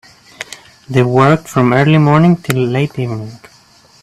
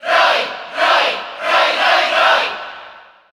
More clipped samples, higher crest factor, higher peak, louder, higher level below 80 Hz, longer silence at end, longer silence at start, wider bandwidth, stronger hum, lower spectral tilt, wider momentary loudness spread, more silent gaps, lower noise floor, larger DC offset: neither; about the same, 14 dB vs 14 dB; about the same, 0 dBFS vs -2 dBFS; about the same, -12 LUFS vs -14 LUFS; first, -48 dBFS vs -64 dBFS; first, 0.65 s vs 0.35 s; first, 0.4 s vs 0 s; second, 14 kHz vs 16 kHz; neither; first, -7 dB/octave vs -0.5 dB/octave; first, 19 LU vs 12 LU; neither; first, -46 dBFS vs -40 dBFS; neither